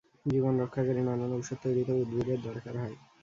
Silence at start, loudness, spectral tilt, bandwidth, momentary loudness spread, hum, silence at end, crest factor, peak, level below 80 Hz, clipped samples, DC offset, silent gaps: 0.25 s; -32 LUFS; -8 dB/octave; 7.6 kHz; 9 LU; none; 0.25 s; 14 dB; -16 dBFS; -62 dBFS; under 0.1%; under 0.1%; none